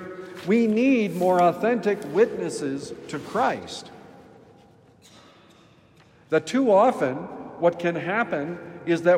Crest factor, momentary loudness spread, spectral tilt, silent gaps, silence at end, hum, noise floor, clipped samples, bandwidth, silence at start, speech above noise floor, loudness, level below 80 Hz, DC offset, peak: 18 dB; 15 LU; -6 dB/octave; none; 0 s; none; -55 dBFS; under 0.1%; 16 kHz; 0 s; 32 dB; -23 LUFS; -68 dBFS; under 0.1%; -6 dBFS